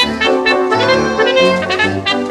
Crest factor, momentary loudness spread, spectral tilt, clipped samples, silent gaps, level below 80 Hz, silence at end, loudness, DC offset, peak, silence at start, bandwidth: 12 dB; 3 LU; -4 dB/octave; under 0.1%; none; -44 dBFS; 0 s; -12 LUFS; under 0.1%; -2 dBFS; 0 s; 12 kHz